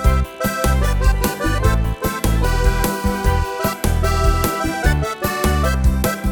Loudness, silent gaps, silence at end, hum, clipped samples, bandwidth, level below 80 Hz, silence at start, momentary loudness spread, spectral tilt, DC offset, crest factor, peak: -19 LUFS; none; 0 s; none; under 0.1%; 19.5 kHz; -20 dBFS; 0 s; 3 LU; -5.5 dB/octave; under 0.1%; 16 dB; -2 dBFS